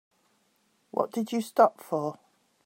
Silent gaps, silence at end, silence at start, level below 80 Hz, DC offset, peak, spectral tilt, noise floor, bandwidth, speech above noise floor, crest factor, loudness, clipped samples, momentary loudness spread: none; 0.55 s; 0.95 s; -84 dBFS; under 0.1%; -6 dBFS; -6 dB/octave; -70 dBFS; 16 kHz; 44 dB; 24 dB; -28 LUFS; under 0.1%; 10 LU